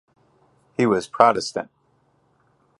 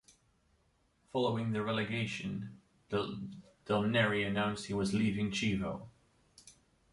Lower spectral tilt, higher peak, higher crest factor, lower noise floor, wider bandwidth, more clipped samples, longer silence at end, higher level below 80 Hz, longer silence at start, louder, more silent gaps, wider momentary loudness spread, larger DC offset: about the same, -5 dB/octave vs -5.5 dB/octave; first, 0 dBFS vs -16 dBFS; about the same, 24 dB vs 20 dB; second, -64 dBFS vs -73 dBFS; about the same, 11.5 kHz vs 11.5 kHz; neither; first, 1.15 s vs 0.4 s; about the same, -64 dBFS vs -62 dBFS; second, 0.8 s vs 1.15 s; first, -21 LUFS vs -34 LUFS; neither; about the same, 16 LU vs 14 LU; neither